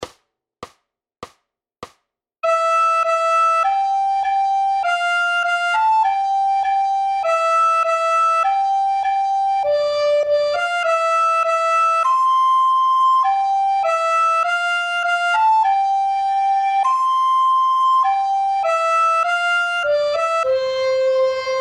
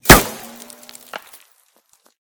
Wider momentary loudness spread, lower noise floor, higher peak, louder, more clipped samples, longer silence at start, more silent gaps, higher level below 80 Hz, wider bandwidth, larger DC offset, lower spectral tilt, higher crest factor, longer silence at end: second, 4 LU vs 27 LU; first, -70 dBFS vs -58 dBFS; second, -8 dBFS vs 0 dBFS; second, -17 LUFS vs -12 LUFS; second, under 0.1% vs 0.9%; about the same, 0 s vs 0.05 s; neither; second, -62 dBFS vs -30 dBFS; second, 12 kHz vs over 20 kHz; neither; second, 0 dB/octave vs -3 dB/octave; second, 10 dB vs 18 dB; second, 0 s vs 1.9 s